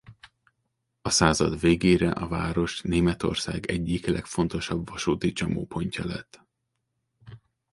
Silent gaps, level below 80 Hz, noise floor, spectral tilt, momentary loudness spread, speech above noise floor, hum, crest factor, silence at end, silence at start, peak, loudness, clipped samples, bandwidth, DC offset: none; -44 dBFS; -79 dBFS; -5 dB/octave; 10 LU; 54 dB; none; 24 dB; 0.35 s; 0.1 s; -4 dBFS; -26 LUFS; under 0.1%; 11.5 kHz; under 0.1%